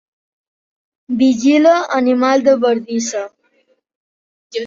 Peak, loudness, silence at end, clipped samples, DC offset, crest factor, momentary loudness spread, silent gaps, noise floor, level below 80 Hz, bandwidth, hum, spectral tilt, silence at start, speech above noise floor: -2 dBFS; -14 LUFS; 0 s; under 0.1%; under 0.1%; 14 dB; 13 LU; 3.95-4.50 s; -60 dBFS; -64 dBFS; 7.6 kHz; none; -4 dB/octave; 1.1 s; 47 dB